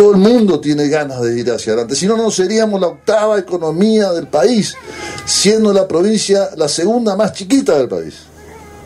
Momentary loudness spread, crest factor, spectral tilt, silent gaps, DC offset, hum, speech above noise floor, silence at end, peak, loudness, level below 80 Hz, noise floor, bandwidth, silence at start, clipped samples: 7 LU; 14 dB; -4.5 dB/octave; none; under 0.1%; none; 23 dB; 0 s; 0 dBFS; -13 LUFS; -50 dBFS; -36 dBFS; 14.5 kHz; 0 s; under 0.1%